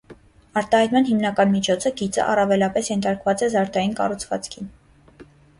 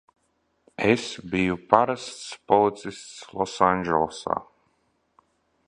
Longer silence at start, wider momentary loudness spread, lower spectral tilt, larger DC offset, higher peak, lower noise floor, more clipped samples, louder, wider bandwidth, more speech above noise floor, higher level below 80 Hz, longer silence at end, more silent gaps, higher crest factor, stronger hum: second, 0.1 s vs 0.8 s; second, 10 LU vs 16 LU; about the same, -5 dB/octave vs -5 dB/octave; neither; second, -6 dBFS vs 0 dBFS; second, -48 dBFS vs -71 dBFS; neither; first, -21 LUFS vs -24 LUFS; about the same, 11.5 kHz vs 11 kHz; second, 28 dB vs 47 dB; about the same, -54 dBFS vs -56 dBFS; second, 0.35 s vs 1.25 s; neither; second, 16 dB vs 26 dB; neither